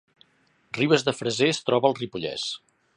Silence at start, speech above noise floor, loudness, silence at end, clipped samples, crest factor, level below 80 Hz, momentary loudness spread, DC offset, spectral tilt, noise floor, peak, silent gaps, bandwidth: 0.75 s; 41 dB; -24 LUFS; 0.4 s; under 0.1%; 22 dB; -66 dBFS; 10 LU; under 0.1%; -4.5 dB/octave; -65 dBFS; -4 dBFS; none; 10.5 kHz